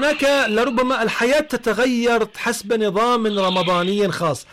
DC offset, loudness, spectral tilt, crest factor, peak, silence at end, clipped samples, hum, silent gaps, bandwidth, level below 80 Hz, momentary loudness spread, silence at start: under 0.1%; -19 LUFS; -4 dB/octave; 8 dB; -10 dBFS; 0.1 s; under 0.1%; none; none; 16 kHz; -50 dBFS; 4 LU; 0 s